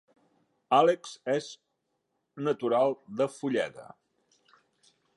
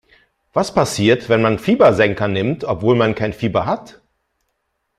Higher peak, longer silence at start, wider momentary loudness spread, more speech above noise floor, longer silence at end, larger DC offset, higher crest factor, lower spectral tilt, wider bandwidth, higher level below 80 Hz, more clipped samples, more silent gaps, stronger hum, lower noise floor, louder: second, -10 dBFS vs -2 dBFS; first, 0.7 s vs 0.55 s; first, 12 LU vs 8 LU; about the same, 52 dB vs 55 dB; first, 1.35 s vs 1.1 s; neither; about the same, 20 dB vs 16 dB; about the same, -5 dB/octave vs -6 dB/octave; second, 11.5 kHz vs 14 kHz; second, -82 dBFS vs -48 dBFS; neither; neither; neither; first, -80 dBFS vs -71 dBFS; second, -28 LUFS vs -17 LUFS